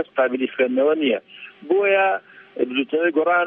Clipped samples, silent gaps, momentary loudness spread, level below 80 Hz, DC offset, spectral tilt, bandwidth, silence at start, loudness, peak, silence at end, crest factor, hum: under 0.1%; none; 11 LU; -76 dBFS; under 0.1%; -8 dB/octave; 3.8 kHz; 0 s; -20 LUFS; -6 dBFS; 0 s; 16 dB; none